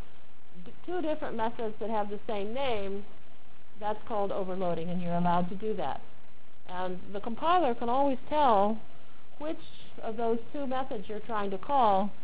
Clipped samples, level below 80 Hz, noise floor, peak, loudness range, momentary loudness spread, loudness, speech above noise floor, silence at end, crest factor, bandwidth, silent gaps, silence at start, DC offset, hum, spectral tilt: under 0.1%; -60 dBFS; -59 dBFS; -14 dBFS; 5 LU; 13 LU; -31 LUFS; 28 dB; 0 s; 20 dB; 4 kHz; none; 0.55 s; 4%; none; -9.5 dB/octave